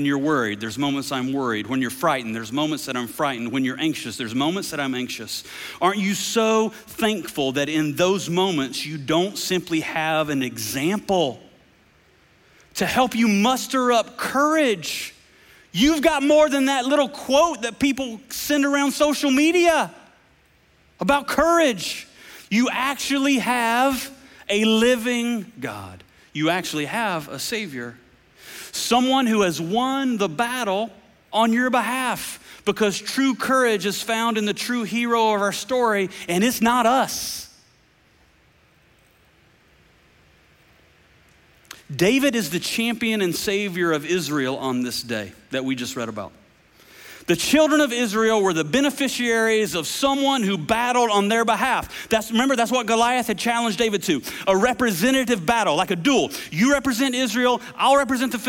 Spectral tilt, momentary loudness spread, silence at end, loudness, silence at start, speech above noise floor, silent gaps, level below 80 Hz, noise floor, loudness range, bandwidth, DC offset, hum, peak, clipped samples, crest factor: -3.5 dB/octave; 10 LU; 0 s; -21 LUFS; 0 s; 37 dB; none; -54 dBFS; -58 dBFS; 5 LU; 17 kHz; under 0.1%; none; -4 dBFS; under 0.1%; 18 dB